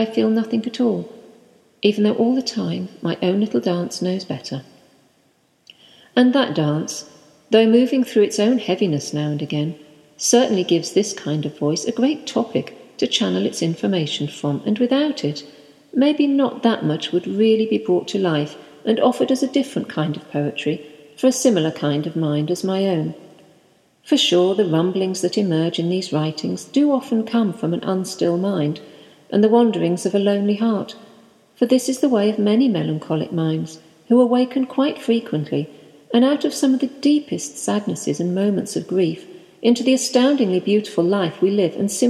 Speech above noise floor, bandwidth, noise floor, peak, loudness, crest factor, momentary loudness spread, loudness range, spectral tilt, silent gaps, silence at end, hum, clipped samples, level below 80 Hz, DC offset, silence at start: 42 dB; 14 kHz; -61 dBFS; -2 dBFS; -20 LUFS; 18 dB; 9 LU; 3 LU; -5.5 dB/octave; none; 0 s; none; under 0.1%; -72 dBFS; under 0.1%; 0 s